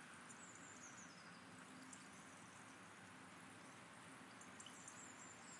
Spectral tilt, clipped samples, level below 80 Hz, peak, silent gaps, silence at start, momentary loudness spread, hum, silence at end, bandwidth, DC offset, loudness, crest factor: -2.5 dB/octave; under 0.1%; under -90 dBFS; -44 dBFS; none; 0 s; 3 LU; none; 0 s; 12 kHz; under 0.1%; -58 LUFS; 16 dB